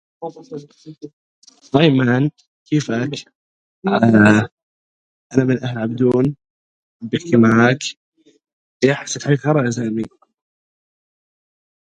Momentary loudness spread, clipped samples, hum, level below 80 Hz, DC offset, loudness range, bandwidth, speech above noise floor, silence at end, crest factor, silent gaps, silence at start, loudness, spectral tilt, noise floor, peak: 20 LU; under 0.1%; none; -56 dBFS; under 0.1%; 5 LU; 9.2 kHz; over 74 dB; 1.85 s; 18 dB; 1.13-1.42 s, 2.47-2.66 s, 3.35-3.82 s, 4.52-4.57 s, 4.63-5.30 s, 6.50-7.00 s, 7.97-8.12 s, 8.53-8.80 s; 0.2 s; -17 LUFS; -6 dB/octave; under -90 dBFS; 0 dBFS